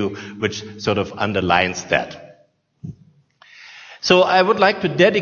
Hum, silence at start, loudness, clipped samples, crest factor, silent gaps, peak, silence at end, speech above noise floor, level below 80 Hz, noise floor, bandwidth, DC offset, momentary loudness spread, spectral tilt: none; 0 s; -18 LUFS; under 0.1%; 20 dB; none; 0 dBFS; 0 s; 40 dB; -56 dBFS; -58 dBFS; 7.4 kHz; under 0.1%; 23 LU; -4.5 dB/octave